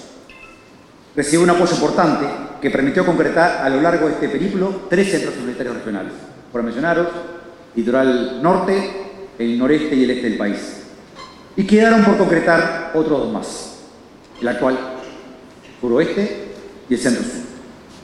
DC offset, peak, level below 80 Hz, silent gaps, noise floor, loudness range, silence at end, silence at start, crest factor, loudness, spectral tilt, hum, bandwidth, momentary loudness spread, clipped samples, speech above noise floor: under 0.1%; 0 dBFS; -48 dBFS; none; -45 dBFS; 6 LU; 0.05 s; 0 s; 18 dB; -18 LUFS; -5.5 dB/octave; none; 12 kHz; 19 LU; under 0.1%; 28 dB